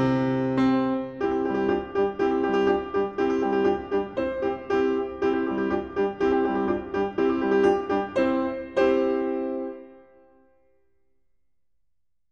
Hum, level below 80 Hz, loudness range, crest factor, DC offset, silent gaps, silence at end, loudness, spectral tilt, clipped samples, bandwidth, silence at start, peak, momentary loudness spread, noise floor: none; -52 dBFS; 5 LU; 16 dB; under 0.1%; none; 2.35 s; -25 LUFS; -7.5 dB/octave; under 0.1%; 7 kHz; 0 s; -8 dBFS; 6 LU; -80 dBFS